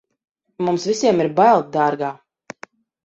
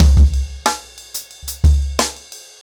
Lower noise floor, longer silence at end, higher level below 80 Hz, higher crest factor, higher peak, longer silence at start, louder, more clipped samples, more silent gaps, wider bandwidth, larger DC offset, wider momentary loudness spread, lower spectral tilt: first, -45 dBFS vs -38 dBFS; first, 0.9 s vs 0.25 s; second, -64 dBFS vs -16 dBFS; about the same, 16 dB vs 12 dB; about the same, -4 dBFS vs -4 dBFS; first, 0.6 s vs 0 s; about the same, -18 LUFS vs -18 LUFS; neither; neither; second, 8.2 kHz vs 20 kHz; neither; first, 24 LU vs 15 LU; about the same, -5.5 dB/octave vs -4.5 dB/octave